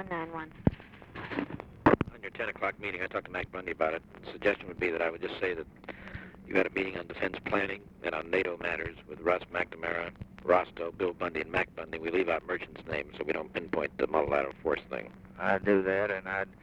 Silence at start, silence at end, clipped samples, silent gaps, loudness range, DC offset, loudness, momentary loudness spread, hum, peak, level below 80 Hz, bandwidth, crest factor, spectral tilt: 0 s; 0.1 s; under 0.1%; none; 2 LU; under 0.1%; -32 LUFS; 12 LU; none; -8 dBFS; -54 dBFS; 9.4 kHz; 24 dB; -7.5 dB/octave